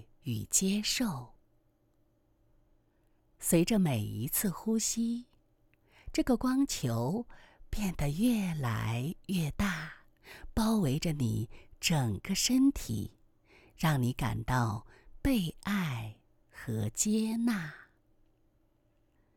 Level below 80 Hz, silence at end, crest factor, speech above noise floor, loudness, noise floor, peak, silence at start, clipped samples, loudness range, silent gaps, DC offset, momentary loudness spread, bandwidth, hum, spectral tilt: -50 dBFS; 1.55 s; 20 dB; 39 dB; -32 LUFS; -70 dBFS; -14 dBFS; 0.25 s; under 0.1%; 3 LU; none; under 0.1%; 11 LU; 20 kHz; none; -4.5 dB/octave